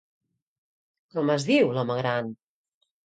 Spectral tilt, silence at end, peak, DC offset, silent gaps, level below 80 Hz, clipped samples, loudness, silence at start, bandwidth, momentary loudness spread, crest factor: -6 dB/octave; 0.7 s; -10 dBFS; under 0.1%; none; -72 dBFS; under 0.1%; -25 LUFS; 1.15 s; 9.2 kHz; 11 LU; 18 dB